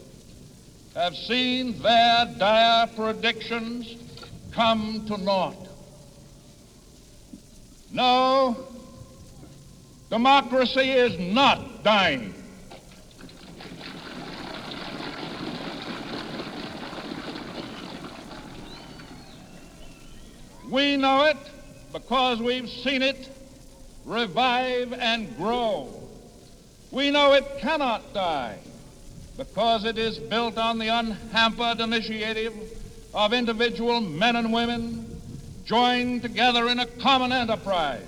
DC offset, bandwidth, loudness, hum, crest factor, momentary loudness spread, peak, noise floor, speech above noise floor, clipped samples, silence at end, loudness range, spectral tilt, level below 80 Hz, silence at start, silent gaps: under 0.1%; 15 kHz; -24 LUFS; none; 20 dB; 22 LU; -6 dBFS; -50 dBFS; 27 dB; under 0.1%; 0 s; 13 LU; -4.5 dB/octave; -50 dBFS; 0 s; none